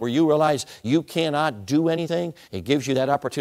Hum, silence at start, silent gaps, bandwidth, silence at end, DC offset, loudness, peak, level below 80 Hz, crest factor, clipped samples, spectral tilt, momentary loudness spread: none; 0 s; none; 15.5 kHz; 0 s; under 0.1%; -23 LUFS; -6 dBFS; -62 dBFS; 16 dB; under 0.1%; -5.5 dB/octave; 7 LU